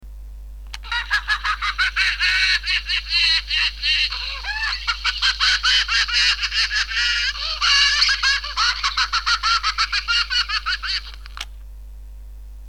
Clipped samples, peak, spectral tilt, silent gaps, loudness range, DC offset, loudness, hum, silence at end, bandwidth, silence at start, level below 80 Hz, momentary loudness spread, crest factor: under 0.1%; -4 dBFS; 1.5 dB/octave; none; 4 LU; 0.3%; -18 LUFS; 50 Hz at -35 dBFS; 0 s; 17.5 kHz; 0 s; -36 dBFS; 10 LU; 18 dB